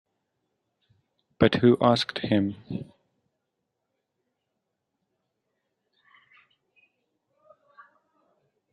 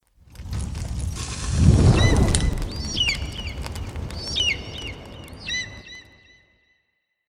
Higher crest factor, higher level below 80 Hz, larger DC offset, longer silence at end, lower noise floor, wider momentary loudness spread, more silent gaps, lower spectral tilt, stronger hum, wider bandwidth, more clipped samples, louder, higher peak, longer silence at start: about the same, 26 dB vs 22 dB; second, -62 dBFS vs -30 dBFS; neither; first, 5.9 s vs 1.3 s; first, -81 dBFS vs -73 dBFS; about the same, 18 LU vs 19 LU; neither; first, -7 dB/octave vs -4.5 dB/octave; neither; second, 10 kHz vs 14.5 kHz; neither; about the same, -24 LUFS vs -23 LUFS; about the same, -4 dBFS vs -2 dBFS; first, 1.4 s vs 0.35 s